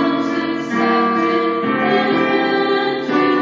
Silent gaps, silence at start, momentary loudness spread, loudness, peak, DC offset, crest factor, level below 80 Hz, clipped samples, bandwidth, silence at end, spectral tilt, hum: none; 0 s; 4 LU; -17 LUFS; -4 dBFS; under 0.1%; 14 dB; -60 dBFS; under 0.1%; 7.6 kHz; 0 s; -6 dB/octave; none